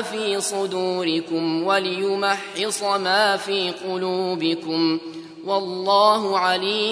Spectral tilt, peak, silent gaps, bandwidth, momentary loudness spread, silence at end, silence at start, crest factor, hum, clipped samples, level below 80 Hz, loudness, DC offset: -3.5 dB/octave; -4 dBFS; none; 11 kHz; 7 LU; 0 s; 0 s; 18 dB; none; under 0.1%; -76 dBFS; -21 LUFS; under 0.1%